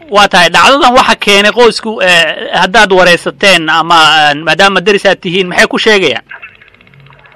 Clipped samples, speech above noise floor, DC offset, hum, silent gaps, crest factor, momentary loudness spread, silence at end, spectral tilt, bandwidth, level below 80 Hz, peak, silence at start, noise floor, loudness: 1%; 32 dB; 1%; none; none; 8 dB; 6 LU; 0.85 s; -3 dB/octave; 16 kHz; -38 dBFS; 0 dBFS; 0.1 s; -39 dBFS; -6 LUFS